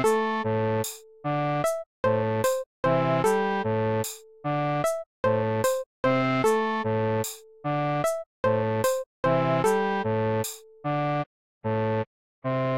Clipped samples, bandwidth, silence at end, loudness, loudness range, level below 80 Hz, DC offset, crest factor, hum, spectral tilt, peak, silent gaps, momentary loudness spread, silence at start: under 0.1%; 16.5 kHz; 0 s; -26 LUFS; 1 LU; -58 dBFS; 0.2%; 14 dB; none; -5.5 dB/octave; -12 dBFS; 1.86-2.03 s, 2.66-2.83 s, 5.06-5.23 s, 5.86-6.03 s, 8.26-8.43 s, 9.06-9.23 s, 11.26-11.61 s, 12.07-12.42 s; 8 LU; 0 s